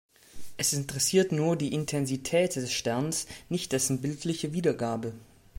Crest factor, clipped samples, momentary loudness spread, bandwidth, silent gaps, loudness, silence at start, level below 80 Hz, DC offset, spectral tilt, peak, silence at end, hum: 18 dB; under 0.1%; 8 LU; 16.5 kHz; none; -29 LUFS; 0.35 s; -60 dBFS; under 0.1%; -4 dB/octave; -12 dBFS; 0.35 s; none